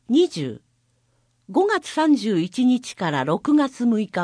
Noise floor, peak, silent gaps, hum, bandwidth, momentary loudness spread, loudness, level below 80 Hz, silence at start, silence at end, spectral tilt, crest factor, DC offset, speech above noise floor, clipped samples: -65 dBFS; -8 dBFS; none; none; 10.5 kHz; 6 LU; -21 LUFS; -68 dBFS; 0.1 s; 0 s; -5.5 dB/octave; 14 dB; under 0.1%; 45 dB; under 0.1%